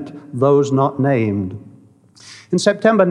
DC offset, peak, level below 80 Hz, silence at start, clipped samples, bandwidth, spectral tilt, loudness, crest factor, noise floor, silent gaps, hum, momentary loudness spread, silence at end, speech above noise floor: under 0.1%; 0 dBFS; -68 dBFS; 0 s; under 0.1%; 11 kHz; -6.5 dB/octave; -16 LUFS; 18 dB; -47 dBFS; none; none; 14 LU; 0 s; 31 dB